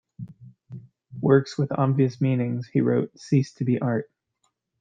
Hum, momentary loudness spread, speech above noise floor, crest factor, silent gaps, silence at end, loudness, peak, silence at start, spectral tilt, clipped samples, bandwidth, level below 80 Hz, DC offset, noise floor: none; 23 LU; 51 dB; 20 dB; none; 0.75 s; -24 LUFS; -6 dBFS; 0.2 s; -8.5 dB/octave; under 0.1%; 7.6 kHz; -66 dBFS; under 0.1%; -74 dBFS